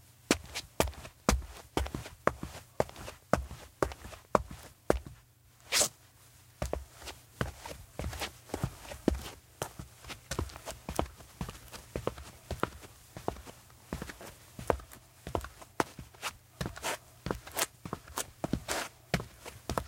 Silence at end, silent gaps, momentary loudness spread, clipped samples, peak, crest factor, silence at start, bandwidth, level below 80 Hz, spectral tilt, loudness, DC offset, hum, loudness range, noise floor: 0 s; none; 15 LU; under 0.1%; -4 dBFS; 34 dB; 0 s; 17 kHz; -46 dBFS; -3.5 dB/octave; -37 LUFS; under 0.1%; none; 7 LU; -61 dBFS